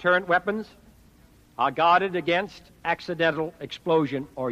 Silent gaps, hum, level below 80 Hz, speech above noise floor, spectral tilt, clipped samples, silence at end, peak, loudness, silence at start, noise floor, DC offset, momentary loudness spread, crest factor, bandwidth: none; none; -60 dBFS; 31 dB; -6 dB/octave; under 0.1%; 0 s; -8 dBFS; -25 LUFS; 0 s; -55 dBFS; under 0.1%; 13 LU; 18 dB; 14.5 kHz